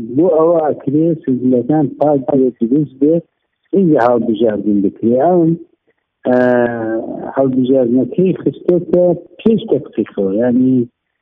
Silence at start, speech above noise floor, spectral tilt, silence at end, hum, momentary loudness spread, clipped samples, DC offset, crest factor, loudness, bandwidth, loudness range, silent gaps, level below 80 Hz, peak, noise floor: 0 s; 48 dB; -11 dB/octave; 0.35 s; none; 6 LU; under 0.1%; under 0.1%; 14 dB; -14 LUFS; 4 kHz; 1 LU; none; -54 dBFS; 0 dBFS; -61 dBFS